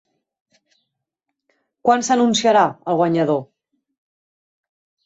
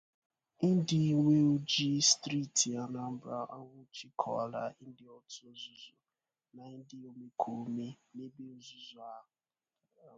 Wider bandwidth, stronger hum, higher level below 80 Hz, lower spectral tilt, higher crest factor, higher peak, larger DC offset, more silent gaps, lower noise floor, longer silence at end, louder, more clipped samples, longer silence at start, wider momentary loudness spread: second, 8.2 kHz vs 9.6 kHz; neither; first, -66 dBFS vs -76 dBFS; about the same, -4.5 dB/octave vs -4 dB/octave; about the same, 18 dB vs 22 dB; first, -4 dBFS vs -14 dBFS; neither; neither; second, -80 dBFS vs under -90 dBFS; first, 1.6 s vs 0.95 s; first, -17 LUFS vs -32 LUFS; neither; first, 1.85 s vs 0.6 s; second, 7 LU vs 23 LU